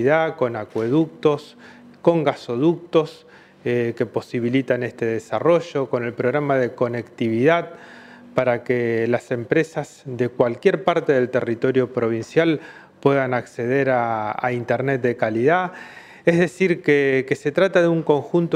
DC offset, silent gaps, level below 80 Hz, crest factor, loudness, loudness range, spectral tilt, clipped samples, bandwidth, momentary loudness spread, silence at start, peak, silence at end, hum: under 0.1%; none; -64 dBFS; 18 dB; -21 LUFS; 3 LU; -7 dB/octave; under 0.1%; 11 kHz; 7 LU; 0 s; -2 dBFS; 0 s; none